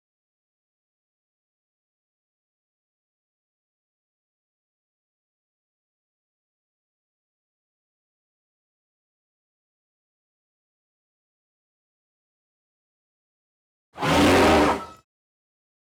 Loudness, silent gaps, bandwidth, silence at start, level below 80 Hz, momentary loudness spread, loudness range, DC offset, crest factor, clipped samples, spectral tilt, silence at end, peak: -19 LUFS; none; over 20 kHz; 13.95 s; -52 dBFS; 12 LU; 6 LU; under 0.1%; 20 dB; under 0.1%; -4.5 dB/octave; 1 s; -12 dBFS